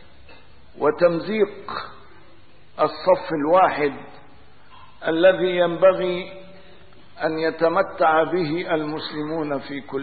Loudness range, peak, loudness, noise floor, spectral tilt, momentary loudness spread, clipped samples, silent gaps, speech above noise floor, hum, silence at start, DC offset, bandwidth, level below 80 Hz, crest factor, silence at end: 3 LU; -4 dBFS; -21 LUFS; -52 dBFS; -10.5 dB/octave; 13 LU; under 0.1%; none; 32 dB; none; 0.3 s; 0.8%; 4.8 kHz; -58 dBFS; 18 dB; 0 s